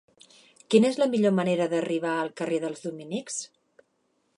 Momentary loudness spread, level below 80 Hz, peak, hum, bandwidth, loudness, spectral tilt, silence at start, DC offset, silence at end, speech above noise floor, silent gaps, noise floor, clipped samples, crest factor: 13 LU; -78 dBFS; -6 dBFS; none; 11 kHz; -26 LUFS; -5 dB/octave; 0.7 s; under 0.1%; 0.9 s; 47 dB; none; -72 dBFS; under 0.1%; 20 dB